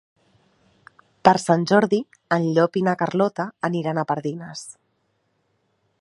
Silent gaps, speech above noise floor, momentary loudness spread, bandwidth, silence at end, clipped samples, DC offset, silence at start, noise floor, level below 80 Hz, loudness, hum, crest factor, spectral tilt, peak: none; 49 dB; 13 LU; 11.5 kHz; 1.3 s; under 0.1%; under 0.1%; 1.25 s; -69 dBFS; -66 dBFS; -21 LUFS; none; 22 dB; -6 dB/octave; 0 dBFS